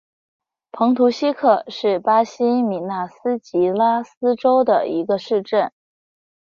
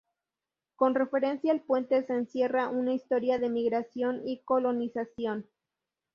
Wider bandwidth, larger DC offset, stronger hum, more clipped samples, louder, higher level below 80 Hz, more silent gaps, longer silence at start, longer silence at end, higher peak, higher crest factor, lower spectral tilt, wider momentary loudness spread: about the same, 7.2 kHz vs 6.6 kHz; neither; neither; neither; first, -19 LUFS vs -29 LUFS; first, -68 dBFS vs -74 dBFS; first, 4.17-4.21 s vs none; about the same, 0.75 s vs 0.8 s; first, 0.9 s vs 0.7 s; first, -2 dBFS vs -12 dBFS; about the same, 18 dB vs 18 dB; about the same, -6.5 dB/octave vs -7 dB/octave; about the same, 7 LU vs 7 LU